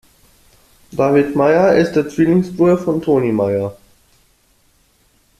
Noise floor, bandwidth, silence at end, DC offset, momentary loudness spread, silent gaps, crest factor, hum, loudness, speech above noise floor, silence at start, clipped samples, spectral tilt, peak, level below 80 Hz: -57 dBFS; 14 kHz; 1.65 s; under 0.1%; 6 LU; none; 14 dB; none; -15 LUFS; 42 dB; 0.9 s; under 0.1%; -8 dB/octave; -2 dBFS; -52 dBFS